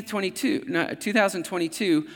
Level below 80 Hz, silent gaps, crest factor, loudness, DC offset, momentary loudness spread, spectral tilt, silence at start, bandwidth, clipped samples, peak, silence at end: -76 dBFS; none; 20 dB; -25 LUFS; under 0.1%; 6 LU; -4 dB/octave; 0 s; 18 kHz; under 0.1%; -6 dBFS; 0 s